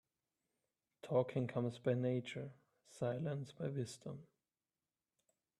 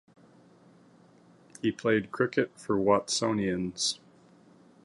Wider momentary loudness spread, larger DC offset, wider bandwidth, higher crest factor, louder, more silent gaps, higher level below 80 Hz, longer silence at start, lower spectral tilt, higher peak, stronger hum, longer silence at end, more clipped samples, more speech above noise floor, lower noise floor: first, 15 LU vs 6 LU; neither; about the same, 12 kHz vs 11.5 kHz; about the same, 22 dB vs 20 dB; second, -41 LUFS vs -29 LUFS; neither; second, -80 dBFS vs -64 dBFS; second, 1.05 s vs 1.65 s; first, -7 dB/octave vs -4 dB/octave; second, -22 dBFS vs -12 dBFS; neither; first, 1.35 s vs 0.9 s; neither; first, over 50 dB vs 30 dB; first, under -90 dBFS vs -58 dBFS